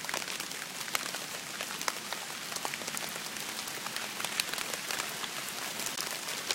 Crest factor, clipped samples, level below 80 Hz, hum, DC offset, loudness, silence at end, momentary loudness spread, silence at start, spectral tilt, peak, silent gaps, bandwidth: 30 dB; under 0.1%; -76 dBFS; none; under 0.1%; -35 LUFS; 0 s; 4 LU; 0 s; 0 dB/octave; -8 dBFS; none; 17 kHz